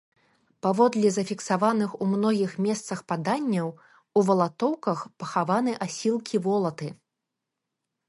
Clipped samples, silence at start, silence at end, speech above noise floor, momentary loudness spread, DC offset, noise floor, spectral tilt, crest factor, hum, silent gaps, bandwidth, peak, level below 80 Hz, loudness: under 0.1%; 0.65 s; 1.15 s; 59 dB; 8 LU; under 0.1%; -84 dBFS; -6 dB/octave; 18 dB; none; none; 11.5 kHz; -8 dBFS; -74 dBFS; -26 LUFS